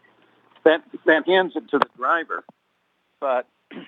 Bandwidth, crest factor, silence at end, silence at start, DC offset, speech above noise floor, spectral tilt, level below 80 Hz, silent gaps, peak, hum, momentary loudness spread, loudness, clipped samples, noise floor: 6.6 kHz; 22 dB; 0.05 s; 0.65 s; under 0.1%; 48 dB; -6 dB/octave; -72 dBFS; none; 0 dBFS; none; 12 LU; -21 LUFS; under 0.1%; -69 dBFS